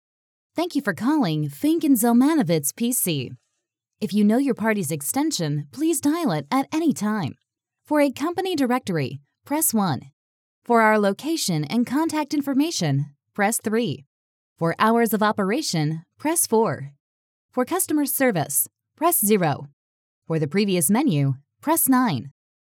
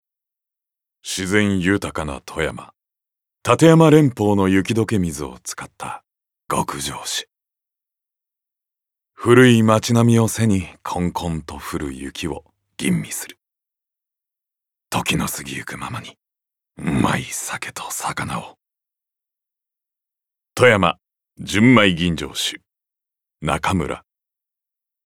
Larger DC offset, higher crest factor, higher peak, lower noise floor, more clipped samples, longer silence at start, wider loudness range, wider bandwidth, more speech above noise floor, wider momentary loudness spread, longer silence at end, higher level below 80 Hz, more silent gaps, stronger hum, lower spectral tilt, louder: neither; about the same, 18 dB vs 20 dB; second, -6 dBFS vs 0 dBFS; second, -80 dBFS vs -84 dBFS; neither; second, 0.55 s vs 1.05 s; second, 3 LU vs 11 LU; first, 19.5 kHz vs 17 kHz; second, 58 dB vs 66 dB; second, 10 LU vs 18 LU; second, 0.4 s vs 1.1 s; second, -86 dBFS vs -48 dBFS; first, 10.13-10.62 s, 14.07-14.56 s, 17.00-17.49 s, 19.73-20.22 s vs none; neither; about the same, -4.5 dB/octave vs -5 dB/octave; second, -22 LUFS vs -19 LUFS